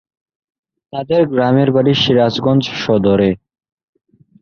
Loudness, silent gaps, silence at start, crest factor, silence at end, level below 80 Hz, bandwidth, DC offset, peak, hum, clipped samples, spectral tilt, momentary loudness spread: -14 LUFS; none; 0.95 s; 14 dB; 1.05 s; -46 dBFS; 6.8 kHz; under 0.1%; -2 dBFS; none; under 0.1%; -7 dB/octave; 8 LU